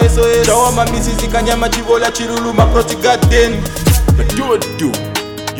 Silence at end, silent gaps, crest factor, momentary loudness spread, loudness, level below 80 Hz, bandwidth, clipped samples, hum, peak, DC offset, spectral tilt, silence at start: 0 s; none; 12 dB; 7 LU; -13 LUFS; -20 dBFS; over 20 kHz; under 0.1%; none; 0 dBFS; under 0.1%; -4.5 dB/octave; 0 s